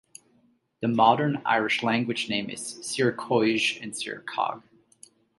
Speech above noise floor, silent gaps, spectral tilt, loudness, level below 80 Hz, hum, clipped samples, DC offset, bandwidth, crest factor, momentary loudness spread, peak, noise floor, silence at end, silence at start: 40 dB; none; -4 dB/octave; -25 LUFS; -70 dBFS; none; under 0.1%; under 0.1%; 11.5 kHz; 22 dB; 12 LU; -6 dBFS; -65 dBFS; 0.8 s; 0.8 s